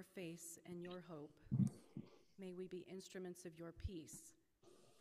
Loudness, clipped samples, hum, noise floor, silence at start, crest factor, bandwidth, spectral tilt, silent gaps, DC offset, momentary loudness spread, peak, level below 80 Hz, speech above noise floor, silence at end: -50 LUFS; under 0.1%; none; -71 dBFS; 0 s; 24 dB; 15.5 kHz; -6.5 dB/octave; none; under 0.1%; 16 LU; -26 dBFS; -68 dBFS; 22 dB; 0 s